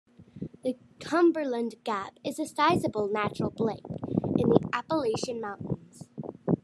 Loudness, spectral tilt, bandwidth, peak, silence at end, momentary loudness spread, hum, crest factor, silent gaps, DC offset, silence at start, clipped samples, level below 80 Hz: -29 LUFS; -6.5 dB/octave; 12.5 kHz; -4 dBFS; 0.05 s; 13 LU; none; 24 dB; none; under 0.1%; 0.2 s; under 0.1%; -60 dBFS